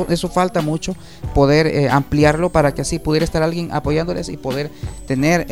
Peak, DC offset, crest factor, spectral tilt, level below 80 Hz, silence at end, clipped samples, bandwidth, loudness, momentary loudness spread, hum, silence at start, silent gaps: 0 dBFS; 0.8%; 18 dB; -6 dB/octave; -32 dBFS; 0 s; under 0.1%; 16 kHz; -18 LUFS; 10 LU; none; 0 s; none